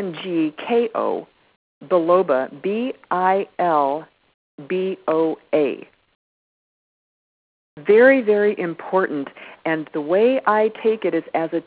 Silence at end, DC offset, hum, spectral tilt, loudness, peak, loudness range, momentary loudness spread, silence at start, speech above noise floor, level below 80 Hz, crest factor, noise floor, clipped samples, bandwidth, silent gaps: 0.05 s; under 0.1%; none; -9.5 dB/octave; -20 LUFS; -2 dBFS; 7 LU; 9 LU; 0 s; over 71 dB; -70 dBFS; 18 dB; under -90 dBFS; under 0.1%; 4 kHz; 1.56-1.81 s, 4.34-4.58 s, 6.15-7.77 s